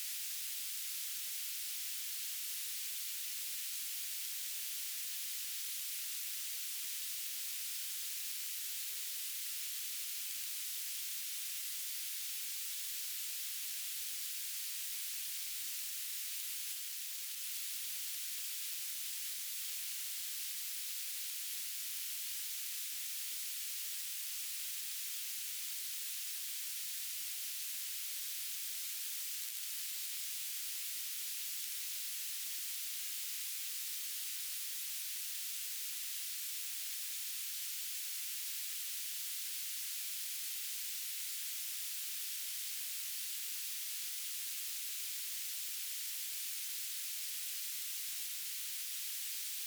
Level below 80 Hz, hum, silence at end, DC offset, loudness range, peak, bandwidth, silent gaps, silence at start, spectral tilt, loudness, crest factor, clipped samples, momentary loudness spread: under -90 dBFS; none; 0 s; under 0.1%; 0 LU; -18 dBFS; over 20 kHz; none; 0 s; 10 dB/octave; -38 LUFS; 24 dB; under 0.1%; 0 LU